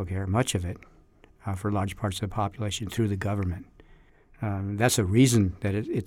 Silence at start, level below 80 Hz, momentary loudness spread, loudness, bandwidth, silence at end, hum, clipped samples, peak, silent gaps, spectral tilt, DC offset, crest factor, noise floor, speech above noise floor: 0 s; -50 dBFS; 14 LU; -27 LUFS; 17 kHz; 0 s; none; under 0.1%; -8 dBFS; none; -5.5 dB/octave; under 0.1%; 18 dB; -56 dBFS; 30 dB